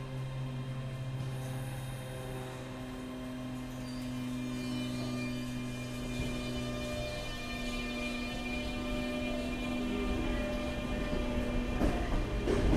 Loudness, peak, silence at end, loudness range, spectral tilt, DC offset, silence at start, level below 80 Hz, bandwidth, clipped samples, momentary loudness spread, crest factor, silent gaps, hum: -37 LUFS; -16 dBFS; 0 s; 5 LU; -6 dB/octave; under 0.1%; 0 s; -42 dBFS; 15.5 kHz; under 0.1%; 7 LU; 18 dB; none; none